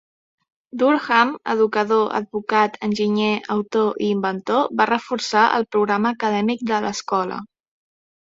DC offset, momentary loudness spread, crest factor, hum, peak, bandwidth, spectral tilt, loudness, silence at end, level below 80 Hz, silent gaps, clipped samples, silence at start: under 0.1%; 6 LU; 18 dB; none; -2 dBFS; 7.8 kHz; -5 dB/octave; -20 LUFS; 0.8 s; -64 dBFS; none; under 0.1%; 0.75 s